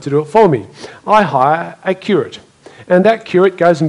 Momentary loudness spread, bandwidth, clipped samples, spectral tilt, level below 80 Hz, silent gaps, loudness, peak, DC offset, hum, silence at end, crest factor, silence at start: 9 LU; 11 kHz; 0.2%; -7 dB/octave; -54 dBFS; none; -13 LUFS; 0 dBFS; under 0.1%; none; 0 s; 14 dB; 0 s